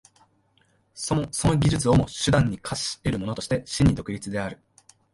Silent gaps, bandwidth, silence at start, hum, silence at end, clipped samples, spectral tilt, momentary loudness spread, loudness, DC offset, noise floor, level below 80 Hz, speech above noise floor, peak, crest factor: none; 11.5 kHz; 0.95 s; none; 0.6 s; under 0.1%; -5.5 dB/octave; 9 LU; -24 LUFS; under 0.1%; -65 dBFS; -40 dBFS; 41 dB; -8 dBFS; 18 dB